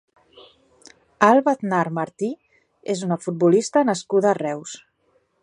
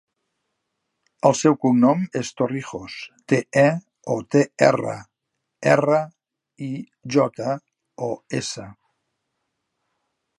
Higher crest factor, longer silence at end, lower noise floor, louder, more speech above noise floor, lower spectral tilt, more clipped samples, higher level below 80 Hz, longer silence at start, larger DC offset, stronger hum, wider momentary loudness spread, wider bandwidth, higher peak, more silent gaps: about the same, 22 dB vs 22 dB; second, 0.65 s vs 1.65 s; second, -65 dBFS vs -79 dBFS; about the same, -21 LUFS vs -21 LUFS; second, 45 dB vs 59 dB; about the same, -5.5 dB/octave vs -6 dB/octave; neither; about the same, -70 dBFS vs -66 dBFS; about the same, 1.2 s vs 1.25 s; neither; neither; about the same, 17 LU vs 16 LU; about the same, 11 kHz vs 11.5 kHz; about the same, 0 dBFS vs 0 dBFS; neither